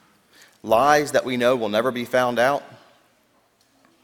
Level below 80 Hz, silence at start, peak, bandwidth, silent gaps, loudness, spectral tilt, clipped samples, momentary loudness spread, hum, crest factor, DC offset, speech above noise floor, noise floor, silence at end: -60 dBFS; 0.65 s; -2 dBFS; 18 kHz; none; -20 LUFS; -4 dB/octave; under 0.1%; 6 LU; none; 20 dB; under 0.1%; 42 dB; -62 dBFS; 1.3 s